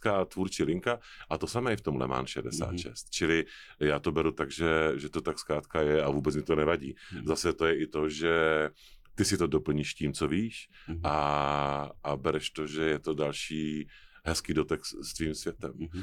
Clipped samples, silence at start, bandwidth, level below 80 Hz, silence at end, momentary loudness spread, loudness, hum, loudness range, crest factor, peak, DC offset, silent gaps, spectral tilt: under 0.1%; 0 s; 16 kHz; -50 dBFS; 0 s; 10 LU; -31 LUFS; none; 3 LU; 18 dB; -14 dBFS; under 0.1%; none; -5 dB/octave